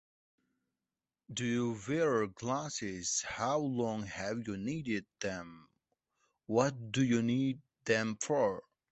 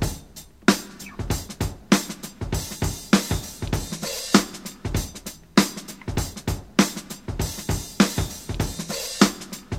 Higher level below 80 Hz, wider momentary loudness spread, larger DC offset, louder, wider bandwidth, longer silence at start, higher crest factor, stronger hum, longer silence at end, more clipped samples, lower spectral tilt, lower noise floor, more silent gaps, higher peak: second, -68 dBFS vs -38 dBFS; second, 9 LU vs 13 LU; second, under 0.1% vs 0.1%; second, -35 LUFS vs -25 LUFS; second, 8.2 kHz vs 16.5 kHz; first, 1.3 s vs 0 s; about the same, 22 dB vs 24 dB; neither; first, 0.3 s vs 0 s; neither; about the same, -4.5 dB/octave vs -4 dB/octave; first, under -90 dBFS vs -45 dBFS; neither; second, -14 dBFS vs 0 dBFS